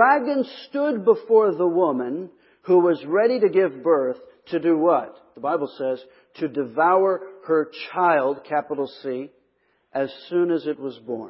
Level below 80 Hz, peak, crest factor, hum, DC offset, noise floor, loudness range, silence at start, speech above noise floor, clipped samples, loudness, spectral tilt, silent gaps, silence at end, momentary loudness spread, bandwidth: -76 dBFS; -2 dBFS; 20 dB; none; under 0.1%; -67 dBFS; 5 LU; 0 s; 45 dB; under 0.1%; -22 LUFS; -10.5 dB/octave; none; 0 s; 13 LU; 5.8 kHz